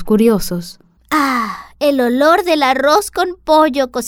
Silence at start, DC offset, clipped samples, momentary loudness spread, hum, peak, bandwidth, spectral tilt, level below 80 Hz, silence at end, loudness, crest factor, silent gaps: 0 s; under 0.1%; under 0.1%; 10 LU; none; -2 dBFS; 18 kHz; -4.5 dB/octave; -40 dBFS; 0 s; -14 LUFS; 12 dB; none